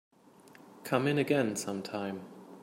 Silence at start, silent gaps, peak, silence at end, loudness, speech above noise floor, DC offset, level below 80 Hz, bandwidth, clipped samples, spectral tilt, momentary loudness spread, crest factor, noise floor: 0.45 s; none; -12 dBFS; 0 s; -32 LUFS; 26 dB; under 0.1%; -78 dBFS; 16 kHz; under 0.1%; -5 dB/octave; 17 LU; 22 dB; -57 dBFS